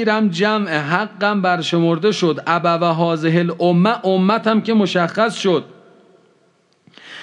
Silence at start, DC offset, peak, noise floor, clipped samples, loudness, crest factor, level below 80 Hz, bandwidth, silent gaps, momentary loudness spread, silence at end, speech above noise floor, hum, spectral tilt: 0 s; under 0.1%; -2 dBFS; -58 dBFS; under 0.1%; -17 LUFS; 16 dB; -76 dBFS; 10 kHz; none; 3 LU; 0 s; 42 dB; none; -6 dB/octave